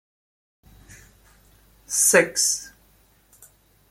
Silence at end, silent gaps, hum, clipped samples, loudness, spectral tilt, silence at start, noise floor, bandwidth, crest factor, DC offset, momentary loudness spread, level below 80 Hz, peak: 1.2 s; none; none; under 0.1%; -19 LUFS; -1 dB/octave; 1.9 s; -59 dBFS; 16.5 kHz; 24 dB; under 0.1%; 12 LU; -60 dBFS; -2 dBFS